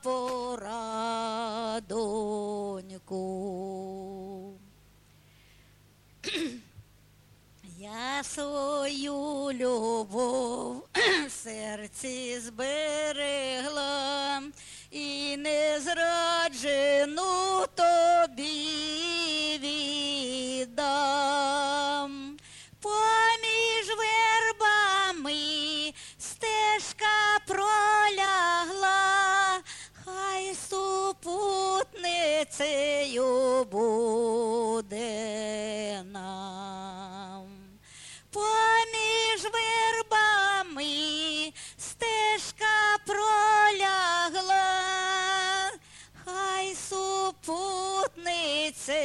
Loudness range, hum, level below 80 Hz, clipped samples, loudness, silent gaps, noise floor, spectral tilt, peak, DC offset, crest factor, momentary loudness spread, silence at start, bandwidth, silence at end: 11 LU; 50 Hz at -70 dBFS; -64 dBFS; under 0.1%; -27 LUFS; none; -59 dBFS; -1.5 dB/octave; -12 dBFS; under 0.1%; 16 dB; 15 LU; 0.05 s; 13 kHz; 0 s